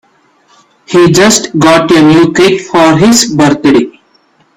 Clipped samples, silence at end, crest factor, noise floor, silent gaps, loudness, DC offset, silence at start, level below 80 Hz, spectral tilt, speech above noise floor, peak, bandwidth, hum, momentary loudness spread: 0.4%; 0.65 s; 8 dB; -49 dBFS; none; -6 LUFS; under 0.1%; 0.9 s; -42 dBFS; -4.5 dB/octave; 43 dB; 0 dBFS; over 20 kHz; none; 4 LU